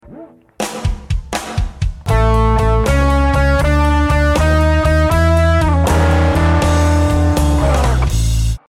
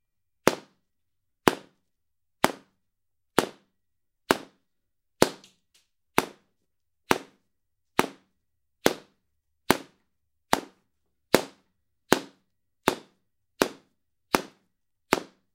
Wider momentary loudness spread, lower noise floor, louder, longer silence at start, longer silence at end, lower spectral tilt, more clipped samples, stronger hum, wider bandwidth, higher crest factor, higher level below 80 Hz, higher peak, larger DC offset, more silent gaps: second, 9 LU vs 14 LU; second, -37 dBFS vs -84 dBFS; first, -14 LUFS vs -28 LUFS; second, 0.1 s vs 0.45 s; second, 0.1 s vs 0.3 s; first, -6 dB/octave vs -3.5 dB/octave; neither; neither; second, 14.5 kHz vs 16 kHz; second, 12 dB vs 32 dB; first, -16 dBFS vs -62 dBFS; about the same, 0 dBFS vs 0 dBFS; neither; neither